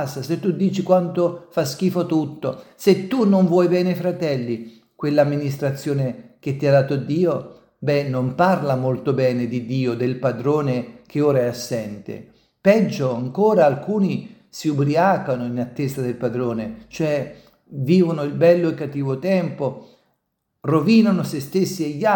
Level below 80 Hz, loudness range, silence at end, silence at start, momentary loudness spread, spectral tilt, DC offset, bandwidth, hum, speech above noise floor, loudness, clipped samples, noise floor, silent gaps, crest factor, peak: -62 dBFS; 3 LU; 0 s; 0 s; 12 LU; -7 dB/octave; under 0.1%; 18 kHz; none; 55 dB; -20 LUFS; under 0.1%; -74 dBFS; none; 18 dB; -2 dBFS